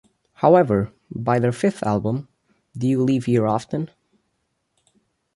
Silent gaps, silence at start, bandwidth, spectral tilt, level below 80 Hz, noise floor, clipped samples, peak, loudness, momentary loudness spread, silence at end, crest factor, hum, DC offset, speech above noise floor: none; 0.4 s; 11.5 kHz; -8 dB/octave; -54 dBFS; -73 dBFS; under 0.1%; -2 dBFS; -21 LUFS; 13 LU; 1.5 s; 20 dB; none; under 0.1%; 53 dB